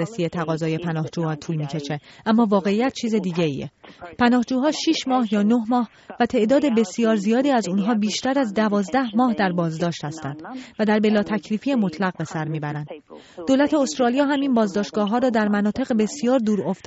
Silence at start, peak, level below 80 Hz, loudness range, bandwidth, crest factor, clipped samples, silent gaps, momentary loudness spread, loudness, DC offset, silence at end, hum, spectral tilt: 0 s; -6 dBFS; -60 dBFS; 3 LU; 8 kHz; 14 dB; under 0.1%; none; 11 LU; -21 LUFS; under 0.1%; 0.1 s; none; -5 dB/octave